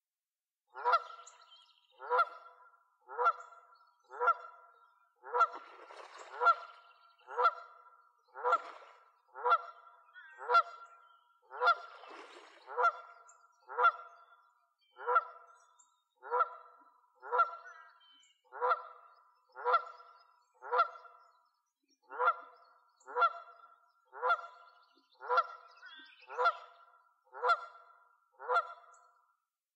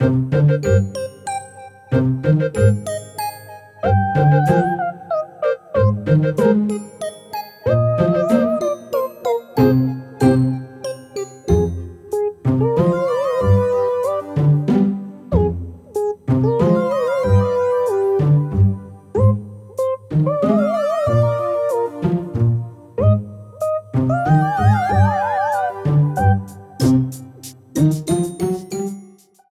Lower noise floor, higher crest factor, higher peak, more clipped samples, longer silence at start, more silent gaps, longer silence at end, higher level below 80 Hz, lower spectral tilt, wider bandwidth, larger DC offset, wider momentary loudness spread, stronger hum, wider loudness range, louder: first, under -90 dBFS vs -45 dBFS; about the same, 20 dB vs 16 dB; second, -18 dBFS vs -2 dBFS; neither; first, 0.75 s vs 0 s; neither; first, 1 s vs 0.45 s; second, under -90 dBFS vs -34 dBFS; second, 1 dB/octave vs -8 dB/octave; second, 8.2 kHz vs 15 kHz; neither; first, 24 LU vs 12 LU; neither; about the same, 3 LU vs 2 LU; second, -33 LUFS vs -18 LUFS